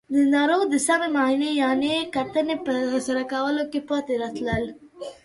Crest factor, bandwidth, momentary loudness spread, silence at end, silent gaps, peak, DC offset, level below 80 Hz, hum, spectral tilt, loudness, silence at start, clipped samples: 14 dB; 11.5 kHz; 7 LU; 0.1 s; none; -8 dBFS; under 0.1%; -54 dBFS; none; -4 dB/octave; -23 LUFS; 0.1 s; under 0.1%